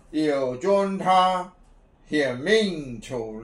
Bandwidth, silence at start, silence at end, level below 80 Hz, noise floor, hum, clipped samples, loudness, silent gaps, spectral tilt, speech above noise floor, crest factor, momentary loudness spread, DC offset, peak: 11.5 kHz; 0.1 s; 0 s; -54 dBFS; -54 dBFS; none; under 0.1%; -23 LUFS; none; -5 dB/octave; 31 dB; 16 dB; 13 LU; under 0.1%; -8 dBFS